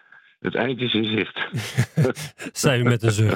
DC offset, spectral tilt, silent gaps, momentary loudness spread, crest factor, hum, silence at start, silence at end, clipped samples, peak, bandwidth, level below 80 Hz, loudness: under 0.1%; -5 dB/octave; none; 9 LU; 20 dB; none; 0.45 s; 0 s; under 0.1%; -2 dBFS; 16.5 kHz; -56 dBFS; -23 LUFS